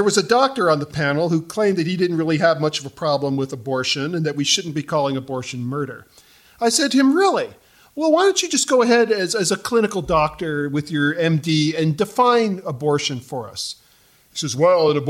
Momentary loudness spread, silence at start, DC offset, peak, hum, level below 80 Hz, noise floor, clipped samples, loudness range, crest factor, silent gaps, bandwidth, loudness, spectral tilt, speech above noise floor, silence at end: 11 LU; 0 s; under 0.1%; -2 dBFS; none; -52 dBFS; -55 dBFS; under 0.1%; 4 LU; 16 dB; none; 16 kHz; -19 LUFS; -4.5 dB/octave; 36 dB; 0 s